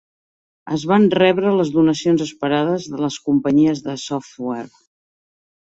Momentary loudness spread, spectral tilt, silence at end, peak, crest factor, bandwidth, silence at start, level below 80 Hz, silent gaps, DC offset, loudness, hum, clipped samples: 12 LU; -6 dB/octave; 1 s; -2 dBFS; 16 dB; 8 kHz; 0.65 s; -58 dBFS; none; under 0.1%; -18 LUFS; none; under 0.1%